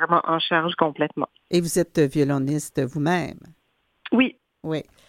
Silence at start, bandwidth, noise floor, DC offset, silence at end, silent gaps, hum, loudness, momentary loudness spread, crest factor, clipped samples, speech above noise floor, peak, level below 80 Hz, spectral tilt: 0 s; 16.5 kHz; -54 dBFS; under 0.1%; 0.25 s; none; none; -23 LUFS; 9 LU; 20 dB; under 0.1%; 31 dB; -4 dBFS; -58 dBFS; -5 dB/octave